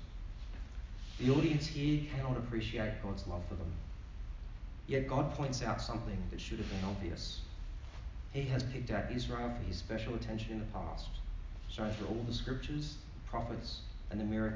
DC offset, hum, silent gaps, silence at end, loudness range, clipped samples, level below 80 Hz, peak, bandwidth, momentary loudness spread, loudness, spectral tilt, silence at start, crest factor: under 0.1%; none; none; 0 s; 5 LU; under 0.1%; -44 dBFS; -18 dBFS; 7.6 kHz; 14 LU; -39 LUFS; -6.5 dB/octave; 0 s; 20 dB